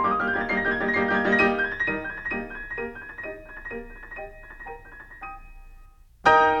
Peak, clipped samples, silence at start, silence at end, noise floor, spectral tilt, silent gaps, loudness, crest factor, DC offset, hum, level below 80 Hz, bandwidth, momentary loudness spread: -4 dBFS; under 0.1%; 0 s; 0 s; -50 dBFS; -5.5 dB/octave; none; -24 LUFS; 22 dB; under 0.1%; none; -46 dBFS; 9 kHz; 20 LU